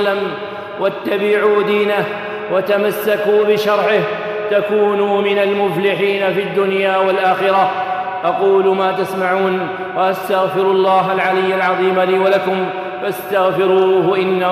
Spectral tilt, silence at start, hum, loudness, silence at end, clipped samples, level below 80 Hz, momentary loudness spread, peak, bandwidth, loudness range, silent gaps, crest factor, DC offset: -6 dB/octave; 0 s; none; -15 LUFS; 0 s; under 0.1%; -64 dBFS; 7 LU; -4 dBFS; 15.5 kHz; 1 LU; none; 12 dB; under 0.1%